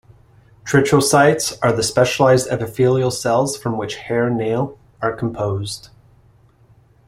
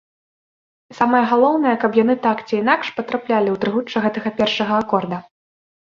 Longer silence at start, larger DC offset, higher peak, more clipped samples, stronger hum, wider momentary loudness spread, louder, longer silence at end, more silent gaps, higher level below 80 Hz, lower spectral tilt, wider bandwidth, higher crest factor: second, 0.65 s vs 0.9 s; neither; about the same, -2 dBFS vs -2 dBFS; neither; neither; first, 11 LU vs 6 LU; about the same, -18 LUFS vs -18 LUFS; first, 1.2 s vs 0.75 s; neither; first, -50 dBFS vs -62 dBFS; about the same, -5 dB/octave vs -6 dB/octave; first, 16 kHz vs 7.2 kHz; about the same, 16 dB vs 18 dB